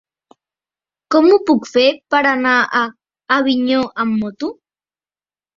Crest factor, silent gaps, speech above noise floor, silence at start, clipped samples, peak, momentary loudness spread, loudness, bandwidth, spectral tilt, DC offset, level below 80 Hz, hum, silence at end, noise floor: 16 dB; none; over 75 dB; 1.1 s; under 0.1%; 0 dBFS; 10 LU; -15 LUFS; 7.6 kHz; -4.5 dB/octave; under 0.1%; -60 dBFS; none; 1.05 s; under -90 dBFS